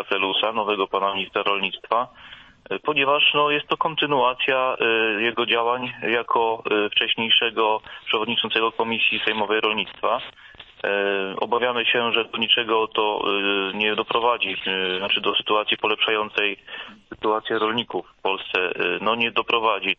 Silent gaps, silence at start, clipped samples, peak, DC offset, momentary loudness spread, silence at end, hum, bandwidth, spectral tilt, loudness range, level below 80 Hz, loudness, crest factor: none; 0 s; under 0.1%; -4 dBFS; under 0.1%; 6 LU; 0.05 s; none; 6.2 kHz; -5.5 dB/octave; 3 LU; -62 dBFS; -21 LUFS; 18 dB